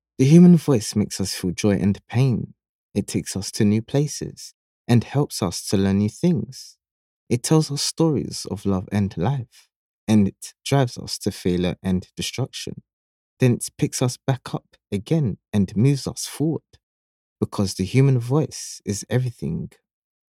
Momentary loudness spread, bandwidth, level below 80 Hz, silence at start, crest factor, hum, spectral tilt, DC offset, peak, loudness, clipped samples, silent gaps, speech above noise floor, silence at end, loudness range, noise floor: 12 LU; 15.5 kHz; -54 dBFS; 0.2 s; 20 dB; none; -6 dB/octave; under 0.1%; -2 dBFS; -22 LUFS; under 0.1%; 2.69-2.89 s, 4.54-4.85 s, 6.91-7.27 s, 9.76-10.07 s, 12.93-13.37 s, 16.83-17.36 s; over 69 dB; 0.65 s; 2 LU; under -90 dBFS